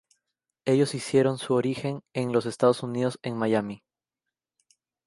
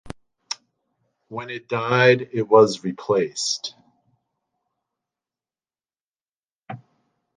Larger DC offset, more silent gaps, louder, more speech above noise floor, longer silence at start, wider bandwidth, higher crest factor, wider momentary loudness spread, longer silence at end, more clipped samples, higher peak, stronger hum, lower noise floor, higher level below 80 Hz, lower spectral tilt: neither; second, none vs 6.01-6.08 s, 6.32-6.41 s, 6.55-6.59 s; second, -26 LUFS vs -20 LUFS; second, 63 dB vs over 70 dB; first, 0.65 s vs 0.05 s; first, 11.5 kHz vs 9.8 kHz; about the same, 20 dB vs 22 dB; second, 8 LU vs 24 LU; first, 1.3 s vs 0.6 s; neither; second, -6 dBFS vs -2 dBFS; neither; about the same, -88 dBFS vs under -90 dBFS; second, -68 dBFS vs -62 dBFS; first, -6 dB/octave vs -4.5 dB/octave